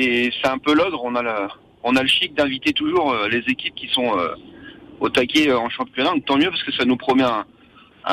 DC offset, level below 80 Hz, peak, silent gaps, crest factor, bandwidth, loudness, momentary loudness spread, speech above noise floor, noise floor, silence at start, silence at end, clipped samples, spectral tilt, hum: under 0.1%; -56 dBFS; -8 dBFS; none; 12 dB; 15.5 kHz; -19 LUFS; 10 LU; 27 dB; -47 dBFS; 0 s; 0 s; under 0.1%; -4 dB/octave; none